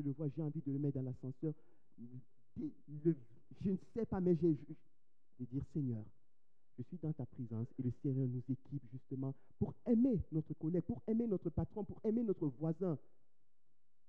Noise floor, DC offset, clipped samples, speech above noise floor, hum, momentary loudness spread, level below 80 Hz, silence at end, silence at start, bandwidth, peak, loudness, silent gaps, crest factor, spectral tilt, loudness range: -87 dBFS; 0.2%; under 0.1%; 47 dB; none; 17 LU; -64 dBFS; 1.1 s; 0 s; 4.3 kHz; -22 dBFS; -40 LUFS; none; 18 dB; -12.5 dB/octave; 6 LU